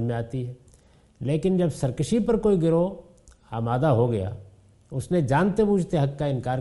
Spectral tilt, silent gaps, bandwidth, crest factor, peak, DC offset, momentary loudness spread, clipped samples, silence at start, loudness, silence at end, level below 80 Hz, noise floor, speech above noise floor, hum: -8 dB/octave; none; 11.5 kHz; 16 dB; -8 dBFS; under 0.1%; 13 LU; under 0.1%; 0 s; -24 LUFS; 0 s; -48 dBFS; -56 dBFS; 33 dB; none